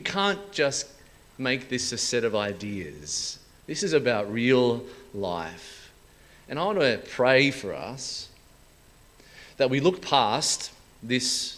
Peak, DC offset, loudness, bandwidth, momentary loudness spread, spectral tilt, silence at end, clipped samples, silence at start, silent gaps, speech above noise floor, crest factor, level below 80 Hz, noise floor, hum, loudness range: -4 dBFS; under 0.1%; -26 LUFS; 16 kHz; 15 LU; -3.5 dB/octave; 0 s; under 0.1%; 0 s; none; 29 dB; 22 dB; -58 dBFS; -55 dBFS; none; 2 LU